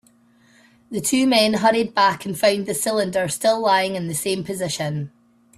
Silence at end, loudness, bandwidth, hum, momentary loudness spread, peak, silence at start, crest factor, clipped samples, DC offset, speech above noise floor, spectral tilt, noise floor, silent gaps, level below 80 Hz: 0.5 s; -20 LUFS; 15.5 kHz; none; 9 LU; -4 dBFS; 0.9 s; 16 dB; under 0.1%; under 0.1%; 36 dB; -3.5 dB/octave; -56 dBFS; none; -62 dBFS